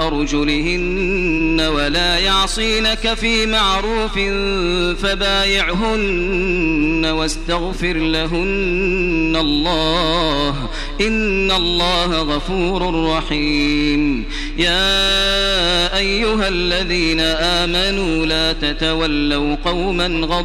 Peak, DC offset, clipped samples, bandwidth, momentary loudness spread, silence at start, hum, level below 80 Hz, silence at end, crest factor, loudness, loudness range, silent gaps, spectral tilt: -2 dBFS; under 0.1%; under 0.1%; 13.5 kHz; 5 LU; 0 s; none; -26 dBFS; 0 s; 14 dB; -16 LUFS; 2 LU; none; -4 dB/octave